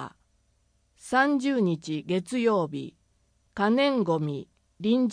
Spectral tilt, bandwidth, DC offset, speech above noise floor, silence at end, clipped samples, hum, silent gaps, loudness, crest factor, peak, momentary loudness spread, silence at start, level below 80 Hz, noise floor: -6 dB/octave; 10.5 kHz; under 0.1%; 43 dB; 0 s; under 0.1%; none; none; -26 LUFS; 18 dB; -10 dBFS; 16 LU; 0 s; -66 dBFS; -68 dBFS